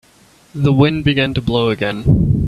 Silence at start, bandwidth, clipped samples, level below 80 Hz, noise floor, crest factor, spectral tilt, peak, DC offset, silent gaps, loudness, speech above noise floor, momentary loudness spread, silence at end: 0.55 s; 10 kHz; under 0.1%; -32 dBFS; -49 dBFS; 14 dB; -8 dB/octave; 0 dBFS; under 0.1%; none; -15 LUFS; 35 dB; 5 LU; 0 s